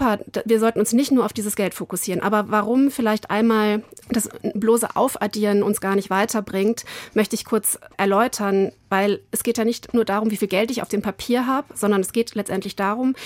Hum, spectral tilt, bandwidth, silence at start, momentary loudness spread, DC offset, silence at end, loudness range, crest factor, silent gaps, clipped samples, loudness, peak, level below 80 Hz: none; -4.5 dB/octave; 16.5 kHz; 0 s; 6 LU; under 0.1%; 0 s; 2 LU; 16 dB; none; under 0.1%; -21 LUFS; -6 dBFS; -56 dBFS